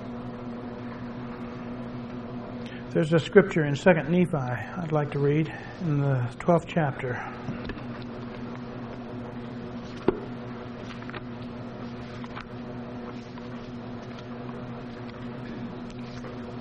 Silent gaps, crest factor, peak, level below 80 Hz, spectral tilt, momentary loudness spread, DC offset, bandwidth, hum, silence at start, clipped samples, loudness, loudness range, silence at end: none; 26 dB; -2 dBFS; -52 dBFS; -7.5 dB/octave; 15 LU; under 0.1%; 9.4 kHz; none; 0 s; under 0.1%; -30 LUFS; 14 LU; 0 s